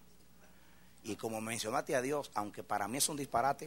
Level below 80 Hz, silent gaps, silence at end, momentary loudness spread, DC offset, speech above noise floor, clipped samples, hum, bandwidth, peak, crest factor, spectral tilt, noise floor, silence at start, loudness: -70 dBFS; none; 0 s; 9 LU; under 0.1%; 27 dB; under 0.1%; none; 16 kHz; -18 dBFS; 20 dB; -3 dB/octave; -63 dBFS; 1.05 s; -36 LUFS